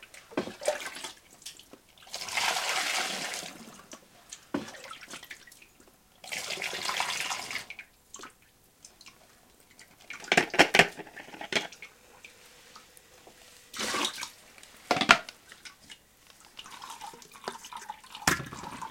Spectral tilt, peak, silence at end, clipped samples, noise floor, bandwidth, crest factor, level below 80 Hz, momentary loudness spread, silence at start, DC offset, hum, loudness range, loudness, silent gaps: -1.5 dB/octave; 0 dBFS; 0 s; under 0.1%; -62 dBFS; 17 kHz; 34 dB; -66 dBFS; 27 LU; 0 s; under 0.1%; none; 10 LU; -29 LUFS; none